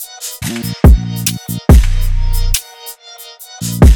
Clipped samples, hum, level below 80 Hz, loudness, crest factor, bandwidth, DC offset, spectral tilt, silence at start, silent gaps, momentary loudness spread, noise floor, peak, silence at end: under 0.1%; none; -14 dBFS; -14 LUFS; 12 dB; 19 kHz; under 0.1%; -5.5 dB/octave; 0 s; none; 20 LU; -35 dBFS; 0 dBFS; 0 s